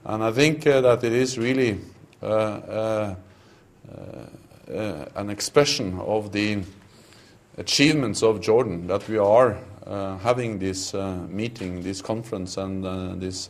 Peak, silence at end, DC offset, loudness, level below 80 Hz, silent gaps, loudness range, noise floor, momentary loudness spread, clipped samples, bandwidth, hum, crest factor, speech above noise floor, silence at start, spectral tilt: -2 dBFS; 0 s; under 0.1%; -23 LUFS; -56 dBFS; none; 7 LU; -53 dBFS; 16 LU; under 0.1%; 15 kHz; none; 22 dB; 30 dB; 0.05 s; -4.5 dB/octave